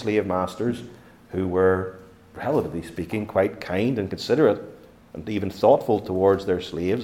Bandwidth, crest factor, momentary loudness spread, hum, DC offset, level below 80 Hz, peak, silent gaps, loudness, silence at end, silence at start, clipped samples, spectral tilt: 16 kHz; 20 dB; 13 LU; none; under 0.1%; -56 dBFS; -4 dBFS; none; -24 LUFS; 0 s; 0 s; under 0.1%; -7 dB/octave